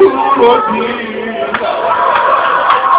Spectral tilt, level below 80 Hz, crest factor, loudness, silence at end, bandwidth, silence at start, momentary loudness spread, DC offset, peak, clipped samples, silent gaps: -8 dB/octave; -48 dBFS; 10 dB; -11 LUFS; 0 s; 4 kHz; 0 s; 9 LU; under 0.1%; 0 dBFS; 0.9%; none